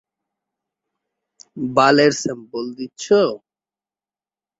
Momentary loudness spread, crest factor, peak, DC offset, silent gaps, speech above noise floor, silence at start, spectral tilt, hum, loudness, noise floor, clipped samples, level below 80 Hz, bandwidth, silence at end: 16 LU; 20 dB; -2 dBFS; under 0.1%; none; over 72 dB; 1.55 s; -4.5 dB/octave; none; -17 LUFS; under -90 dBFS; under 0.1%; -64 dBFS; 8 kHz; 1.2 s